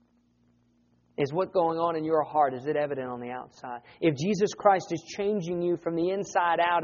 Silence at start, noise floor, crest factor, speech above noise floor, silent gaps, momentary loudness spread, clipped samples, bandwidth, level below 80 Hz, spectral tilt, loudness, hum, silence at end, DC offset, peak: 1.2 s; -66 dBFS; 22 dB; 39 dB; none; 13 LU; under 0.1%; 7.2 kHz; -68 dBFS; -4.5 dB/octave; -27 LUFS; 60 Hz at -65 dBFS; 0 s; under 0.1%; -6 dBFS